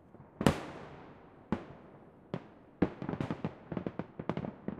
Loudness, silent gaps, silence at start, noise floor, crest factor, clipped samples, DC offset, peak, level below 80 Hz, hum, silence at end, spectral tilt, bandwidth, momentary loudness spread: -38 LUFS; none; 0.05 s; -56 dBFS; 32 dB; under 0.1%; under 0.1%; -6 dBFS; -58 dBFS; none; 0 s; -6.5 dB/octave; 14 kHz; 24 LU